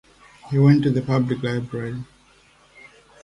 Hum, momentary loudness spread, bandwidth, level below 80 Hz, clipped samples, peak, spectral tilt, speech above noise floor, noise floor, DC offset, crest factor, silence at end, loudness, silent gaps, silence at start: none; 16 LU; 9.2 kHz; -54 dBFS; under 0.1%; -4 dBFS; -8.5 dB/octave; 35 dB; -55 dBFS; under 0.1%; 18 dB; 1.2 s; -21 LUFS; none; 0.45 s